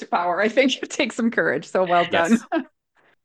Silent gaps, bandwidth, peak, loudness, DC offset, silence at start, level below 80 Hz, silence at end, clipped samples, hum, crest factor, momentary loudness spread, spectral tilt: none; 12 kHz; -6 dBFS; -21 LUFS; under 0.1%; 0 s; -68 dBFS; 0.6 s; under 0.1%; none; 16 dB; 5 LU; -4 dB/octave